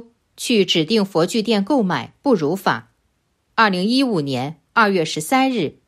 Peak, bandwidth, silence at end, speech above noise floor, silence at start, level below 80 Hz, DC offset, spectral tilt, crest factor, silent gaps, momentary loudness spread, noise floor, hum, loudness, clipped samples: 0 dBFS; 15.5 kHz; 0.15 s; 49 dB; 0.4 s; -64 dBFS; under 0.1%; -4.5 dB/octave; 18 dB; none; 6 LU; -67 dBFS; none; -19 LUFS; under 0.1%